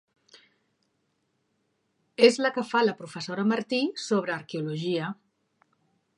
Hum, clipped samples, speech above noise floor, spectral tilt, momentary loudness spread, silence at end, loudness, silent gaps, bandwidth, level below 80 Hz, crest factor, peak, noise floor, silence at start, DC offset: none; under 0.1%; 49 dB; -5 dB/octave; 15 LU; 1.05 s; -26 LUFS; none; 11.5 kHz; -82 dBFS; 24 dB; -4 dBFS; -75 dBFS; 2.2 s; under 0.1%